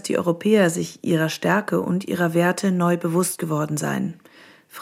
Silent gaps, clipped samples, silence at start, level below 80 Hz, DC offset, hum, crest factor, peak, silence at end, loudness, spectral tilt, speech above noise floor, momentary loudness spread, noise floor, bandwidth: none; under 0.1%; 0.05 s; -68 dBFS; under 0.1%; none; 16 dB; -4 dBFS; 0 s; -22 LUFS; -5.5 dB/octave; 27 dB; 7 LU; -48 dBFS; 16 kHz